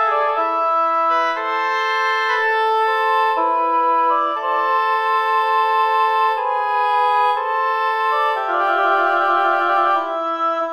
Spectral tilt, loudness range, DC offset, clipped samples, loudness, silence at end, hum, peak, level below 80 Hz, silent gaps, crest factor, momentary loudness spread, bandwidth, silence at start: -1 dB/octave; 0 LU; under 0.1%; under 0.1%; -17 LUFS; 0 s; none; -6 dBFS; -76 dBFS; none; 12 dB; 3 LU; 14 kHz; 0 s